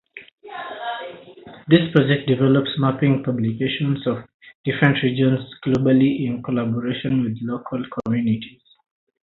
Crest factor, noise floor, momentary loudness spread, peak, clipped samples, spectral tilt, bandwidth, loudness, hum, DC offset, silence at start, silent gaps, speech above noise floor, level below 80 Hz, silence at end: 20 dB; -42 dBFS; 13 LU; 0 dBFS; under 0.1%; -9 dB/octave; 4.4 kHz; -21 LUFS; none; under 0.1%; 0.15 s; 0.33-0.38 s, 4.34-4.40 s, 4.55-4.64 s; 23 dB; -56 dBFS; 0.8 s